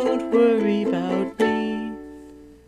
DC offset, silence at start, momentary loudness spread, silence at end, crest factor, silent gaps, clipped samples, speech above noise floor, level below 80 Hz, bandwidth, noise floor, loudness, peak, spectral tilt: under 0.1%; 0 s; 15 LU; 0.2 s; 16 dB; none; under 0.1%; 24 dB; -56 dBFS; 11.5 kHz; -44 dBFS; -22 LUFS; -8 dBFS; -7 dB/octave